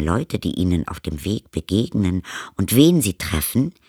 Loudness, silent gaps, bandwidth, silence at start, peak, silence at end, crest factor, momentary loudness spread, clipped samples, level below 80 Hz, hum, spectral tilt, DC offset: -20 LUFS; none; over 20 kHz; 0 s; -2 dBFS; 0.2 s; 20 dB; 12 LU; under 0.1%; -38 dBFS; none; -5.5 dB/octave; under 0.1%